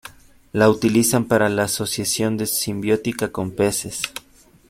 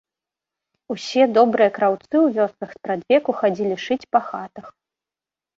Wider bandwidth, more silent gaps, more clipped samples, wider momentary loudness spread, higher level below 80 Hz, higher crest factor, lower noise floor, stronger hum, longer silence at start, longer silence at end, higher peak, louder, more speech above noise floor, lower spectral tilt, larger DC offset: first, 16.5 kHz vs 7.8 kHz; neither; neither; second, 10 LU vs 16 LU; first, -52 dBFS vs -68 dBFS; about the same, 20 dB vs 18 dB; second, -52 dBFS vs -90 dBFS; neither; second, 0.05 s vs 0.9 s; second, 0.5 s vs 0.9 s; about the same, -2 dBFS vs -4 dBFS; about the same, -20 LUFS vs -20 LUFS; second, 32 dB vs 70 dB; second, -4 dB/octave vs -5.5 dB/octave; neither